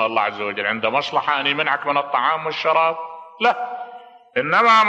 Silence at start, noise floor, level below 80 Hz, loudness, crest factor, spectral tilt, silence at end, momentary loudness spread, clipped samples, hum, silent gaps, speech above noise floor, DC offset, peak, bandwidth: 0 s; -41 dBFS; -72 dBFS; -20 LUFS; 18 dB; -4 dB/octave; 0 s; 11 LU; under 0.1%; none; none; 22 dB; under 0.1%; -2 dBFS; 8.6 kHz